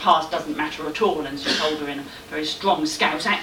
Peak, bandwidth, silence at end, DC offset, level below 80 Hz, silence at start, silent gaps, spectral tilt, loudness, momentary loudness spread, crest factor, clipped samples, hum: -6 dBFS; 18 kHz; 0 s; under 0.1%; -54 dBFS; 0 s; none; -3 dB/octave; -23 LUFS; 8 LU; 18 dB; under 0.1%; none